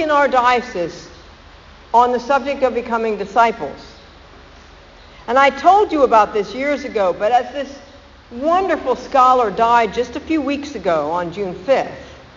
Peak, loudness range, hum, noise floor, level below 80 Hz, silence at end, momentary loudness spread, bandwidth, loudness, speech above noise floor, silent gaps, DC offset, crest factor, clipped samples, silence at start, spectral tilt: 0 dBFS; 3 LU; none; -42 dBFS; -46 dBFS; 0.15 s; 14 LU; 7.6 kHz; -16 LUFS; 26 dB; none; under 0.1%; 18 dB; under 0.1%; 0 s; -2.5 dB/octave